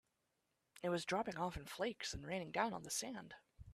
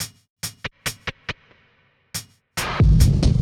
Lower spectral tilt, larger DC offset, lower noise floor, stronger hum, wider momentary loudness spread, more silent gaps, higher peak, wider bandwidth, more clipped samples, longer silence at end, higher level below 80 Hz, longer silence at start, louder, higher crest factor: second, -3.5 dB/octave vs -5 dB/octave; neither; first, -86 dBFS vs -61 dBFS; neither; second, 10 LU vs 17 LU; second, none vs 0.30-0.36 s; second, -22 dBFS vs -4 dBFS; second, 15 kHz vs 17 kHz; neither; about the same, 0 s vs 0 s; second, -66 dBFS vs -26 dBFS; first, 0.75 s vs 0 s; second, -43 LUFS vs -23 LUFS; about the same, 22 dB vs 18 dB